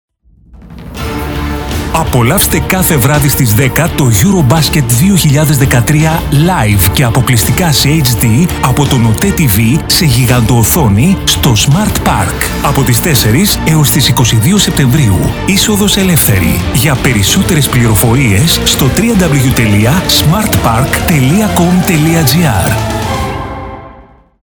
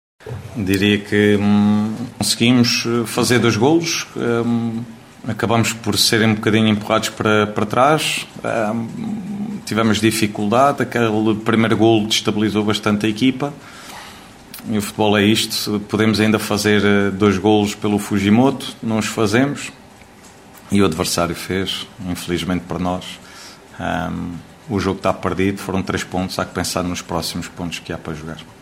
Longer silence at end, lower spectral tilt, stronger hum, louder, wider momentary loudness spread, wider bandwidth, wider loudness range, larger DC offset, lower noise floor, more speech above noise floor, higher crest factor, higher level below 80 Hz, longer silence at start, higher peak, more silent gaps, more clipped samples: first, 0.4 s vs 0.1 s; about the same, -4.5 dB/octave vs -4.5 dB/octave; neither; first, -8 LUFS vs -18 LUFS; second, 5 LU vs 14 LU; first, over 20 kHz vs 16 kHz; second, 2 LU vs 6 LU; neither; about the same, -40 dBFS vs -43 dBFS; first, 32 dB vs 25 dB; second, 8 dB vs 16 dB; first, -22 dBFS vs -52 dBFS; first, 0.55 s vs 0.25 s; about the same, 0 dBFS vs -2 dBFS; neither; neither